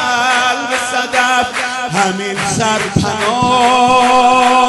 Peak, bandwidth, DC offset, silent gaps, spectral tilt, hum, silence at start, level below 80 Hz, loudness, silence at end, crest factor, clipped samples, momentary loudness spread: 0 dBFS; 12 kHz; under 0.1%; none; -3 dB/octave; none; 0 s; -42 dBFS; -12 LUFS; 0 s; 12 dB; under 0.1%; 7 LU